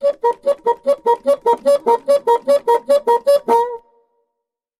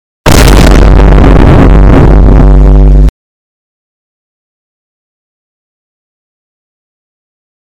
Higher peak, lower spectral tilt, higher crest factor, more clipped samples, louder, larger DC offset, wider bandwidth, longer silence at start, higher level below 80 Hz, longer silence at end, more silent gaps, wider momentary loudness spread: second, -4 dBFS vs 0 dBFS; second, -3.5 dB/octave vs -6.5 dB/octave; first, 12 dB vs 4 dB; second, under 0.1% vs 20%; second, -16 LUFS vs -4 LUFS; neither; about the same, 15 kHz vs 16.5 kHz; second, 0 s vs 0.25 s; second, -64 dBFS vs -6 dBFS; second, 1 s vs 4.7 s; neither; about the same, 4 LU vs 3 LU